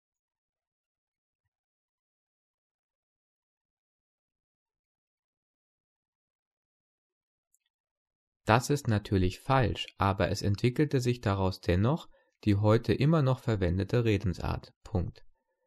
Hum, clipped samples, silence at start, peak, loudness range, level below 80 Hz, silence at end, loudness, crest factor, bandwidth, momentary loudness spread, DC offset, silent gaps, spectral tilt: none; under 0.1%; 8.45 s; -8 dBFS; 5 LU; -50 dBFS; 0.4 s; -29 LUFS; 22 dB; 13 kHz; 9 LU; under 0.1%; 14.76-14.81 s; -7 dB/octave